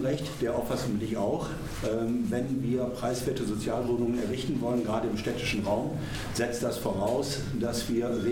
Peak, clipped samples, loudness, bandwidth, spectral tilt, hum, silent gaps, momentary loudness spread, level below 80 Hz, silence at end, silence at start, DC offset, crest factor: -14 dBFS; under 0.1%; -30 LUFS; 18.5 kHz; -5.5 dB/octave; none; none; 3 LU; -48 dBFS; 0 s; 0 s; under 0.1%; 16 dB